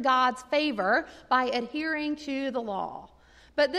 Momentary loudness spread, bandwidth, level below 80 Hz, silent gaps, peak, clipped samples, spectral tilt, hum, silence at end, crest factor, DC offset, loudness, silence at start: 10 LU; 12 kHz; -62 dBFS; none; -12 dBFS; under 0.1%; -4 dB/octave; none; 0 s; 16 dB; under 0.1%; -28 LUFS; 0 s